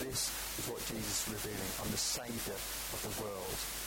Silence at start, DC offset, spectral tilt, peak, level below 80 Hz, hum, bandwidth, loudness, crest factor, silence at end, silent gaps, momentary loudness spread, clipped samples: 0 s; under 0.1%; -2 dB/octave; -24 dBFS; -54 dBFS; none; 17 kHz; -37 LUFS; 16 dB; 0 s; none; 4 LU; under 0.1%